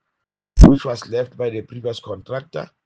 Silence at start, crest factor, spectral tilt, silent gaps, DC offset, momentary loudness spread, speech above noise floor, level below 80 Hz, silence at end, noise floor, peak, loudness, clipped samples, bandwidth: 0.55 s; 18 dB; -7.5 dB/octave; none; under 0.1%; 17 LU; 55 dB; -22 dBFS; 0.2 s; -79 dBFS; 0 dBFS; -18 LUFS; 0.9%; 8.6 kHz